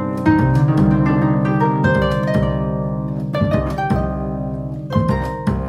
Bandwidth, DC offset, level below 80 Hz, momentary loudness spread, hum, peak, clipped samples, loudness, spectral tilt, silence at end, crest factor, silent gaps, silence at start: 10 kHz; under 0.1%; -30 dBFS; 8 LU; none; -2 dBFS; under 0.1%; -18 LUFS; -9 dB/octave; 0 s; 16 dB; none; 0 s